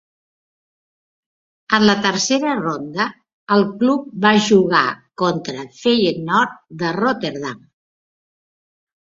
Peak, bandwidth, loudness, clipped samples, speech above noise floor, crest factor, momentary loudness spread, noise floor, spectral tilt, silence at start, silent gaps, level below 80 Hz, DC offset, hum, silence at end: -2 dBFS; 7.8 kHz; -18 LUFS; under 0.1%; over 73 dB; 18 dB; 10 LU; under -90 dBFS; -4.5 dB/octave; 1.7 s; 3.34-3.47 s; -60 dBFS; under 0.1%; none; 1.45 s